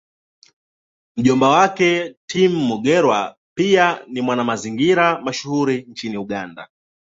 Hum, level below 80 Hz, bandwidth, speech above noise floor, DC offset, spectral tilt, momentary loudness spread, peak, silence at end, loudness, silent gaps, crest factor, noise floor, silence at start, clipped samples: none; -60 dBFS; 7.8 kHz; over 73 dB; under 0.1%; -5 dB/octave; 13 LU; -2 dBFS; 0.45 s; -18 LUFS; 2.17-2.28 s, 3.37-3.56 s; 18 dB; under -90 dBFS; 1.15 s; under 0.1%